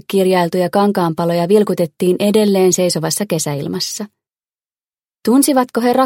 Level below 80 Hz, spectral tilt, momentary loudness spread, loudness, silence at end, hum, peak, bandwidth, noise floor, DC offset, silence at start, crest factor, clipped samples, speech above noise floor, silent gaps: -62 dBFS; -5 dB/octave; 8 LU; -15 LUFS; 0 s; none; 0 dBFS; 17 kHz; under -90 dBFS; under 0.1%; 0.1 s; 14 dB; under 0.1%; over 76 dB; none